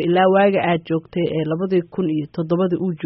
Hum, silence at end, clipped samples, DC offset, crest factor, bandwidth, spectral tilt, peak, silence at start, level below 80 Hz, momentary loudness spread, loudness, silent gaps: none; 0 s; under 0.1%; under 0.1%; 14 dB; 5.8 kHz; -6 dB/octave; -4 dBFS; 0 s; -58 dBFS; 8 LU; -19 LUFS; none